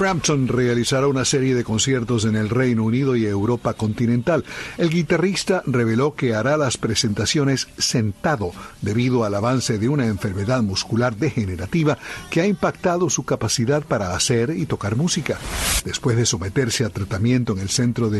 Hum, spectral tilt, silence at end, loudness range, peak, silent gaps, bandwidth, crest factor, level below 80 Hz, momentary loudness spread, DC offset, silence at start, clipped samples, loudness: none; -5 dB/octave; 0 s; 2 LU; -6 dBFS; none; 12.5 kHz; 14 dB; -42 dBFS; 4 LU; under 0.1%; 0 s; under 0.1%; -20 LUFS